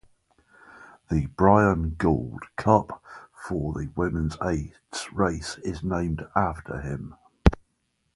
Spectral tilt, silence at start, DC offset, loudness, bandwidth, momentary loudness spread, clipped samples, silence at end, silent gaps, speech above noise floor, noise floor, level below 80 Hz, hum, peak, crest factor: -7 dB/octave; 0.75 s; under 0.1%; -26 LUFS; 11.5 kHz; 15 LU; under 0.1%; 0.6 s; none; 48 dB; -73 dBFS; -36 dBFS; none; 0 dBFS; 26 dB